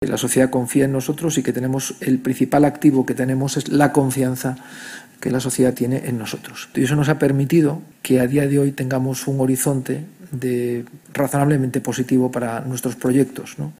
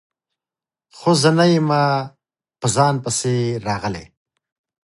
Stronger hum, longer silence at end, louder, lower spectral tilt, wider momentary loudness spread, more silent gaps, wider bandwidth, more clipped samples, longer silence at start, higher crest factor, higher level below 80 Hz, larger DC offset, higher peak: neither; second, 0.05 s vs 0.8 s; about the same, -19 LUFS vs -18 LUFS; about the same, -6 dB/octave vs -5 dB/octave; about the same, 11 LU vs 10 LU; neither; first, 16 kHz vs 11.5 kHz; neither; second, 0 s vs 0.95 s; about the same, 18 dB vs 18 dB; about the same, -54 dBFS vs -54 dBFS; neither; about the same, -2 dBFS vs -2 dBFS